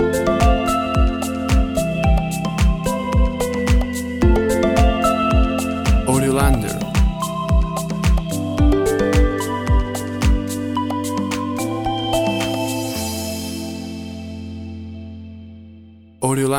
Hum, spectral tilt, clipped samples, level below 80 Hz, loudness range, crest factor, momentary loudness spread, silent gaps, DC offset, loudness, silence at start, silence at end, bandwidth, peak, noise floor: none; -6 dB/octave; under 0.1%; -22 dBFS; 7 LU; 18 dB; 14 LU; none; under 0.1%; -19 LUFS; 0 s; 0 s; 17 kHz; -2 dBFS; -43 dBFS